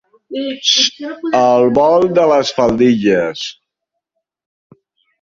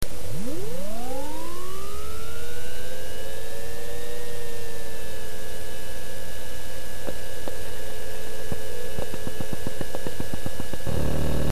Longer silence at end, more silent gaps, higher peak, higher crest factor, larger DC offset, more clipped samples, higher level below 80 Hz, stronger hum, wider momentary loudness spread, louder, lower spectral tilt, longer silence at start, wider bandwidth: first, 1.7 s vs 0 s; neither; first, 0 dBFS vs -10 dBFS; second, 14 dB vs 24 dB; second, under 0.1% vs 20%; neither; second, -50 dBFS vs -40 dBFS; neither; first, 13 LU vs 5 LU; first, -13 LUFS vs -35 LUFS; about the same, -4 dB/octave vs -4.5 dB/octave; first, 0.3 s vs 0 s; second, 7.6 kHz vs 14 kHz